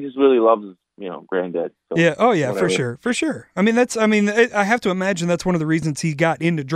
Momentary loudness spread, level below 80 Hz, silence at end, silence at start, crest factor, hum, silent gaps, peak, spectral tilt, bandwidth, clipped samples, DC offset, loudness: 9 LU; -56 dBFS; 0 s; 0 s; 18 dB; none; none; -2 dBFS; -5.5 dB/octave; 14 kHz; under 0.1%; under 0.1%; -19 LUFS